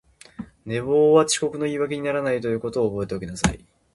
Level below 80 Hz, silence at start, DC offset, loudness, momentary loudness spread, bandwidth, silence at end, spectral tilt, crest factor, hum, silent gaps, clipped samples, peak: -44 dBFS; 0.4 s; under 0.1%; -22 LUFS; 18 LU; 11.5 kHz; 0.35 s; -4.5 dB/octave; 22 dB; none; none; under 0.1%; -2 dBFS